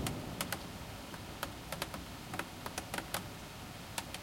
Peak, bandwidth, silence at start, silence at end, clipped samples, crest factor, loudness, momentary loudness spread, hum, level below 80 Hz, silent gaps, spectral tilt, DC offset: -18 dBFS; 16.5 kHz; 0 s; 0 s; under 0.1%; 24 dB; -42 LUFS; 7 LU; none; -56 dBFS; none; -3.5 dB/octave; under 0.1%